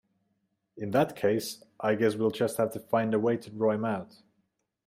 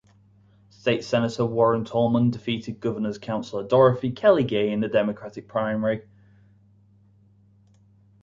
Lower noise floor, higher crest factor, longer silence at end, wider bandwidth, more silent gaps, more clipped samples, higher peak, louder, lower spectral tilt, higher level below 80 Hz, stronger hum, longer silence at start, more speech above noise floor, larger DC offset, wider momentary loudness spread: first, -77 dBFS vs -57 dBFS; about the same, 18 dB vs 20 dB; second, 0.8 s vs 2.2 s; first, 16 kHz vs 7.6 kHz; neither; neither; second, -12 dBFS vs -6 dBFS; second, -29 LUFS vs -23 LUFS; about the same, -6 dB/octave vs -7 dB/octave; second, -72 dBFS vs -60 dBFS; neither; about the same, 0.75 s vs 0.85 s; first, 49 dB vs 34 dB; neither; second, 7 LU vs 10 LU